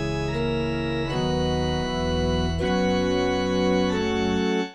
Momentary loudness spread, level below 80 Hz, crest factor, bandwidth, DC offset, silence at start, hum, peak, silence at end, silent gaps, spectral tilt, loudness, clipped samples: 4 LU; -36 dBFS; 14 dB; 9.4 kHz; 0.1%; 0 s; none; -10 dBFS; 0 s; none; -6 dB/octave; -24 LUFS; under 0.1%